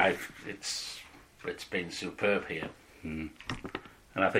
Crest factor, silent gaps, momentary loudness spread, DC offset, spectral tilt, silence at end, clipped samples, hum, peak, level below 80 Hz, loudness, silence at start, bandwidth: 22 dB; none; 14 LU; under 0.1%; -3.5 dB/octave; 0 s; under 0.1%; none; -12 dBFS; -58 dBFS; -36 LUFS; 0 s; 16.5 kHz